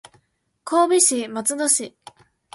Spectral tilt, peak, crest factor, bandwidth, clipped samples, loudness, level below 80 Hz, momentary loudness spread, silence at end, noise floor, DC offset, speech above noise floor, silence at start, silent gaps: -1.5 dB/octave; -2 dBFS; 20 dB; 12 kHz; under 0.1%; -19 LUFS; -72 dBFS; 15 LU; 0.65 s; -66 dBFS; under 0.1%; 46 dB; 0.65 s; none